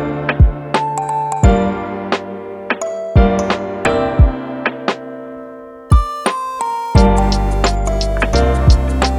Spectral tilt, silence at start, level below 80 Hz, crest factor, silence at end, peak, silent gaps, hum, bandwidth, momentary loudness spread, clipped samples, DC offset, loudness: -6 dB/octave; 0 s; -18 dBFS; 14 dB; 0 s; 0 dBFS; none; none; 11 kHz; 11 LU; under 0.1%; under 0.1%; -16 LUFS